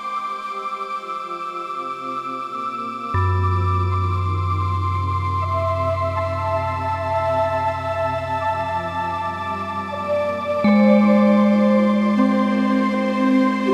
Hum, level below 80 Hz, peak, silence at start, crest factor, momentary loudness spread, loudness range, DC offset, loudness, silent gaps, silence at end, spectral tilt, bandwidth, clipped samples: none; -46 dBFS; -4 dBFS; 0 s; 16 dB; 12 LU; 7 LU; under 0.1%; -20 LUFS; none; 0 s; -8 dB/octave; 9 kHz; under 0.1%